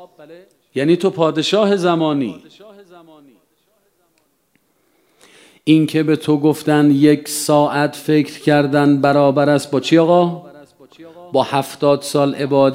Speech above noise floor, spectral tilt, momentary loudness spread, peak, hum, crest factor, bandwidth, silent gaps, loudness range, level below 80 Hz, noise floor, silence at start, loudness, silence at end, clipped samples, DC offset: 47 dB; -6 dB/octave; 7 LU; 0 dBFS; none; 16 dB; 16 kHz; none; 8 LU; -66 dBFS; -62 dBFS; 0 s; -15 LUFS; 0 s; under 0.1%; under 0.1%